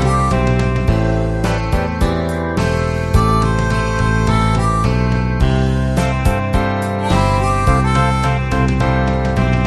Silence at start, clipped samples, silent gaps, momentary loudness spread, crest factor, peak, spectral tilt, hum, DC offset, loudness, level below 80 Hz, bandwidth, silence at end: 0 s; under 0.1%; none; 3 LU; 14 dB; 0 dBFS; -6.5 dB/octave; none; under 0.1%; -16 LUFS; -22 dBFS; 13 kHz; 0 s